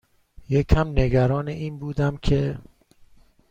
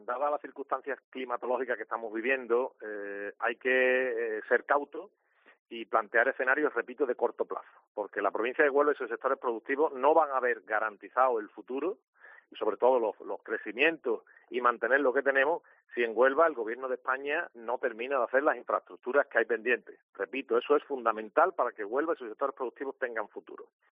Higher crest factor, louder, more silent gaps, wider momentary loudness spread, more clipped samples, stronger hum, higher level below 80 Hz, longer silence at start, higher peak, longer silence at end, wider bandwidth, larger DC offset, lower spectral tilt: about the same, 22 dB vs 20 dB; first, -23 LUFS vs -30 LUFS; second, none vs 1.04-1.12 s, 5.59-5.66 s, 7.87-7.95 s, 12.08-12.13 s, 20.03-20.13 s; about the same, 10 LU vs 12 LU; neither; neither; first, -32 dBFS vs -86 dBFS; first, 0.5 s vs 0.1 s; first, -2 dBFS vs -10 dBFS; first, 0.9 s vs 0.25 s; first, 8 kHz vs 3.8 kHz; neither; first, -8 dB/octave vs -0.5 dB/octave